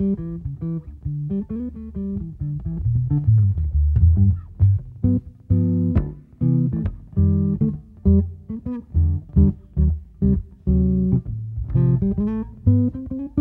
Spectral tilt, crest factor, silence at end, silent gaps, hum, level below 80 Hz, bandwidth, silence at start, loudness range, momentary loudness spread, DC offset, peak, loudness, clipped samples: -14 dB/octave; 16 dB; 0 s; none; none; -28 dBFS; 2.3 kHz; 0 s; 3 LU; 11 LU; under 0.1%; -4 dBFS; -22 LUFS; under 0.1%